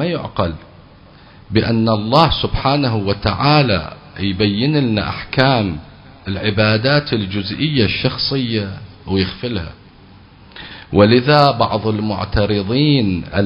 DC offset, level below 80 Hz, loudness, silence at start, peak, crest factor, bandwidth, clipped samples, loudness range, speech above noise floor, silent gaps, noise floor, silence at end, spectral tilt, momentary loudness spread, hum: under 0.1%; -34 dBFS; -16 LUFS; 0 s; 0 dBFS; 16 dB; 8 kHz; under 0.1%; 4 LU; 27 dB; none; -43 dBFS; 0 s; -8.5 dB/octave; 12 LU; none